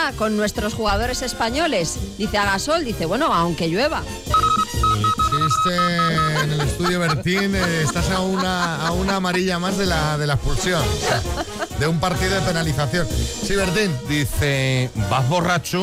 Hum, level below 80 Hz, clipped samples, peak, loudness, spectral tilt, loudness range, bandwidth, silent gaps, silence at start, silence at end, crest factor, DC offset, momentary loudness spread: none; -32 dBFS; under 0.1%; -8 dBFS; -20 LUFS; -4.5 dB/octave; 2 LU; 16 kHz; none; 0 s; 0 s; 12 dB; under 0.1%; 4 LU